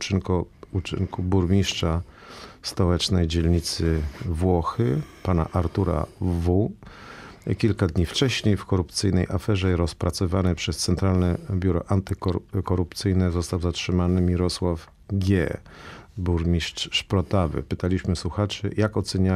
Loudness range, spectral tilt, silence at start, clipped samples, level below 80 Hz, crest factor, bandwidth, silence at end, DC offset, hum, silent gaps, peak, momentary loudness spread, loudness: 2 LU; -6 dB/octave; 0 s; under 0.1%; -42 dBFS; 16 dB; 13 kHz; 0 s; under 0.1%; none; none; -8 dBFS; 8 LU; -24 LUFS